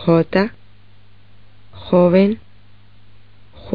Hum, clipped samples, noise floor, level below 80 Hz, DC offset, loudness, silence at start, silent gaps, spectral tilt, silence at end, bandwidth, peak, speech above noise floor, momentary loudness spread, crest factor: 50 Hz at -40 dBFS; under 0.1%; -50 dBFS; -50 dBFS; 1%; -16 LUFS; 0 s; none; -7 dB/octave; 0 s; 5 kHz; -2 dBFS; 35 dB; 15 LU; 18 dB